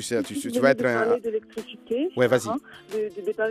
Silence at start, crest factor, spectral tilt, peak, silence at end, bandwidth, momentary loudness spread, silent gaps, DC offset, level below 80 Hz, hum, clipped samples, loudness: 0 s; 20 dB; -5 dB/octave; -6 dBFS; 0 s; 15.5 kHz; 12 LU; none; under 0.1%; -68 dBFS; none; under 0.1%; -25 LUFS